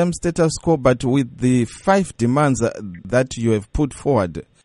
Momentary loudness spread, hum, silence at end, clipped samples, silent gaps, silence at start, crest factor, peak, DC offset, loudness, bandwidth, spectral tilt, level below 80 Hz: 5 LU; none; 0.2 s; under 0.1%; none; 0 s; 18 dB; -2 dBFS; under 0.1%; -19 LUFS; 11.5 kHz; -6.5 dB/octave; -38 dBFS